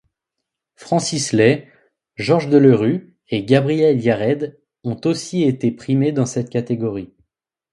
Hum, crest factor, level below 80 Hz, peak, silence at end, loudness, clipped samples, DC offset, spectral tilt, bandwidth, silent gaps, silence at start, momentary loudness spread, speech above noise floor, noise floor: none; 18 dB; -56 dBFS; 0 dBFS; 0.65 s; -18 LUFS; under 0.1%; under 0.1%; -6 dB/octave; 11.5 kHz; none; 0.8 s; 12 LU; 64 dB; -81 dBFS